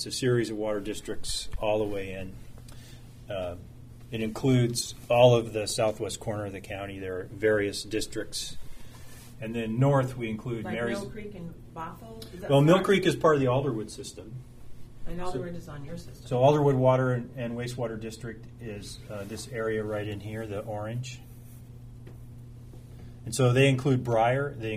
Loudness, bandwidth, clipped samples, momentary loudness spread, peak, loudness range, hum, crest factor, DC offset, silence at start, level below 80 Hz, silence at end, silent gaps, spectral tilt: -28 LUFS; 15.5 kHz; under 0.1%; 24 LU; -8 dBFS; 9 LU; none; 22 dB; under 0.1%; 0 s; -50 dBFS; 0 s; none; -5.5 dB/octave